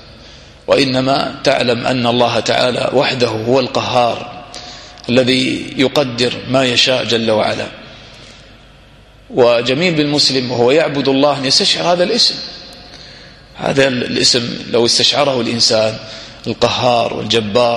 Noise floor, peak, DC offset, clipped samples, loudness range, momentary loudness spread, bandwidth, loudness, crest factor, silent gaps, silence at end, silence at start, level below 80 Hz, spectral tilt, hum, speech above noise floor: -42 dBFS; 0 dBFS; under 0.1%; under 0.1%; 3 LU; 16 LU; 13 kHz; -13 LUFS; 14 dB; none; 0 s; 0.05 s; -46 dBFS; -3.5 dB/octave; none; 29 dB